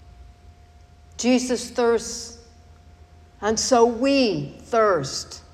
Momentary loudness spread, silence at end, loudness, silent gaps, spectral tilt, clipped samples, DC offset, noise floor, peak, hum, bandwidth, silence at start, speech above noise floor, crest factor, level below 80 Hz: 13 LU; 0.15 s; -22 LUFS; none; -3.5 dB/octave; under 0.1%; under 0.1%; -50 dBFS; -6 dBFS; none; 13.5 kHz; 0.05 s; 28 dB; 18 dB; -50 dBFS